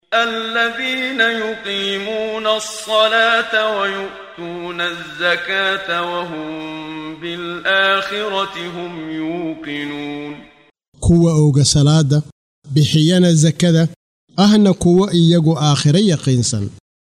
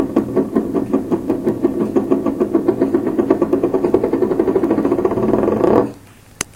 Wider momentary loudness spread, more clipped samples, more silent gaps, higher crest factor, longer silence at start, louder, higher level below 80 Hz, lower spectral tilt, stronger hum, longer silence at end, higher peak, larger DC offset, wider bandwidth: first, 15 LU vs 4 LU; neither; first, 10.88-10.92 s, 12.32-12.62 s, 13.96-14.27 s vs none; about the same, 14 dB vs 16 dB; about the same, 0.1 s vs 0 s; about the same, -16 LUFS vs -17 LUFS; about the same, -40 dBFS vs -44 dBFS; second, -5 dB/octave vs -7 dB/octave; neither; first, 0.35 s vs 0.1 s; about the same, -2 dBFS vs 0 dBFS; neither; second, 13 kHz vs 16.5 kHz